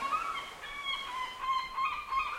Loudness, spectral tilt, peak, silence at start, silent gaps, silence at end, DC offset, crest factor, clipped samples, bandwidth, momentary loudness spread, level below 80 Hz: -35 LUFS; -1 dB/octave; -20 dBFS; 0 s; none; 0 s; under 0.1%; 14 dB; under 0.1%; 16.5 kHz; 6 LU; -60 dBFS